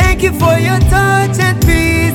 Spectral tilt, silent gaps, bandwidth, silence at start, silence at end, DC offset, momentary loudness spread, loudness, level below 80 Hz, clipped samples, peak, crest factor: -5.5 dB/octave; none; 19 kHz; 0 s; 0 s; under 0.1%; 1 LU; -11 LUFS; -18 dBFS; under 0.1%; 0 dBFS; 10 dB